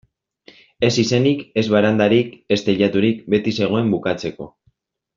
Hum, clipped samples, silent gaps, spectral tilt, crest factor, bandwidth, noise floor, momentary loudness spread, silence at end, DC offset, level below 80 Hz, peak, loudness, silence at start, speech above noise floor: none; under 0.1%; none; -6 dB/octave; 16 dB; 7.6 kHz; -63 dBFS; 8 LU; 0.7 s; under 0.1%; -56 dBFS; -2 dBFS; -18 LUFS; 0.8 s; 46 dB